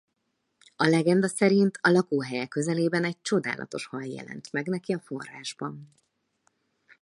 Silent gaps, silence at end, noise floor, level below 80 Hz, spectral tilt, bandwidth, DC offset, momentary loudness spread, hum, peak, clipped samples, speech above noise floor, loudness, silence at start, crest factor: none; 1.15 s; -77 dBFS; -74 dBFS; -5.5 dB/octave; 11.5 kHz; under 0.1%; 15 LU; none; -8 dBFS; under 0.1%; 51 dB; -26 LUFS; 0.8 s; 20 dB